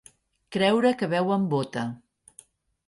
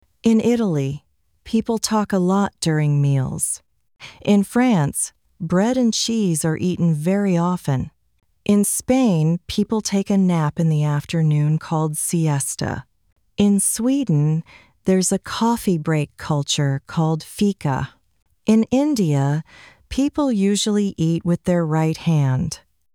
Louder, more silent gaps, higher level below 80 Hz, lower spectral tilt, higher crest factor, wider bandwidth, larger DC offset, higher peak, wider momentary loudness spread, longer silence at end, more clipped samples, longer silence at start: second, -25 LUFS vs -20 LUFS; neither; second, -66 dBFS vs -50 dBFS; about the same, -6 dB/octave vs -5.5 dB/octave; about the same, 18 dB vs 16 dB; second, 11.5 kHz vs 18.5 kHz; neither; second, -8 dBFS vs -4 dBFS; first, 13 LU vs 8 LU; first, 0.9 s vs 0.35 s; neither; first, 0.5 s vs 0.25 s